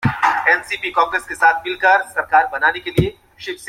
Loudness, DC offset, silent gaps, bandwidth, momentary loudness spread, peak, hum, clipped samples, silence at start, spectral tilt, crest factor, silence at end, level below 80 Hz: -16 LUFS; under 0.1%; none; 16 kHz; 6 LU; -2 dBFS; none; under 0.1%; 0 s; -5 dB/octave; 16 dB; 0 s; -42 dBFS